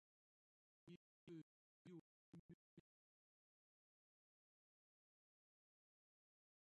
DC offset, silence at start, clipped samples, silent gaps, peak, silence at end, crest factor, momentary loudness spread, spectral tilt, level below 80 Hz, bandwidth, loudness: under 0.1%; 0.85 s; under 0.1%; 0.96-1.27 s, 1.42-1.85 s, 2.01-2.32 s, 2.39-2.77 s; -50 dBFS; 3.9 s; 20 dB; 6 LU; -7.5 dB/octave; under -90 dBFS; 4 kHz; -65 LUFS